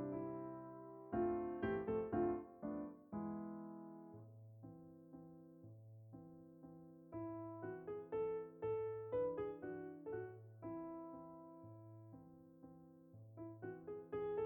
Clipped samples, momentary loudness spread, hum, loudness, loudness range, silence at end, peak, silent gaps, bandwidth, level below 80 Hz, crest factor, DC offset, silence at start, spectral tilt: under 0.1%; 19 LU; none; -47 LUFS; 12 LU; 0 s; -28 dBFS; none; 18.5 kHz; -72 dBFS; 18 dB; under 0.1%; 0 s; -10 dB/octave